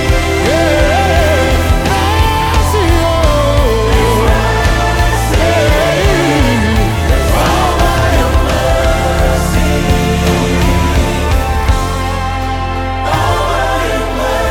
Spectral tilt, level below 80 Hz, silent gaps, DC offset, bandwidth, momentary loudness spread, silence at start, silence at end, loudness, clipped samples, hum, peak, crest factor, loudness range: -5 dB/octave; -16 dBFS; none; under 0.1%; 18 kHz; 4 LU; 0 s; 0 s; -12 LUFS; under 0.1%; none; 0 dBFS; 10 dB; 3 LU